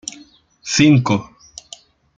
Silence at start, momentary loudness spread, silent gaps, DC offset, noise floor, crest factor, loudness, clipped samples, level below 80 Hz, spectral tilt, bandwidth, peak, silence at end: 0.65 s; 24 LU; none; under 0.1%; -47 dBFS; 18 dB; -15 LUFS; under 0.1%; -54 dBFS; -5 dB/octave; 9.2 kHz; -2 dBFS; 0.95 s